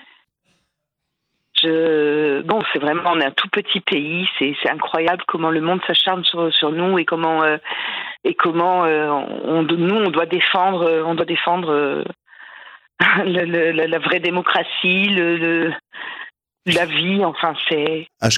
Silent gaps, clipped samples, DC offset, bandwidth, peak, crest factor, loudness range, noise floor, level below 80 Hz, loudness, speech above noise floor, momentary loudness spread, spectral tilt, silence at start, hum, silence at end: none; under 0.1%; under 0.1%; 12 kHz; 0 dBFS; 18 dB; 1 LU; -78 dBFS; -66 dBFS; -18 LUFS; 60 dB; 7 LU; -4.5 dB/octave; 1.55 s; none; 0 s